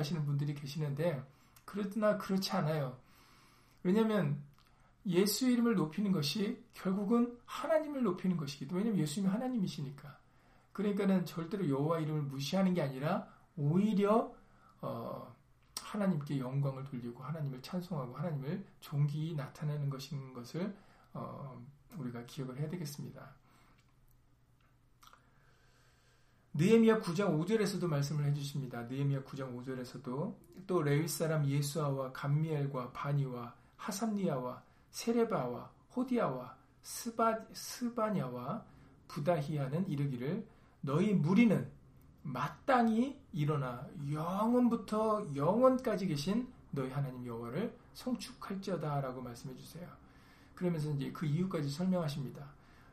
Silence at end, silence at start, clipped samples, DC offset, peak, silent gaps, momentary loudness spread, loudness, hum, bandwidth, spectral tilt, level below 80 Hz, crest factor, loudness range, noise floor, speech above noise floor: 0.4 s; 0 s; under 0.1%; under 0.1%; -14 dBFS; none; 15 LU; -35 LUFS; none; 15.5 kHz; -6.5 dB/octave; -68 dBFS; 22 dB; 8 LU; -68 dBFS; 33 dB